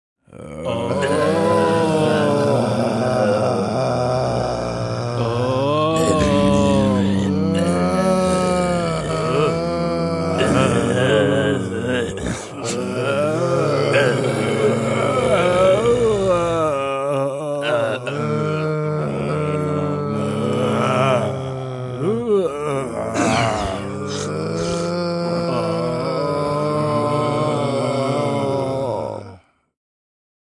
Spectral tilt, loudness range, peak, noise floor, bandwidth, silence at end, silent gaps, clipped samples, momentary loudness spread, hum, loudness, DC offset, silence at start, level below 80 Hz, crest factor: -6 dB/octave; 4 LU; -2 dBFS; -44 dBFS; 12 kHz; 1.2 s; none; under 0.1%; 7 LU; none; -19 LUFS; under 0.1%; 0.3 s; -44 dBFS; 16 dB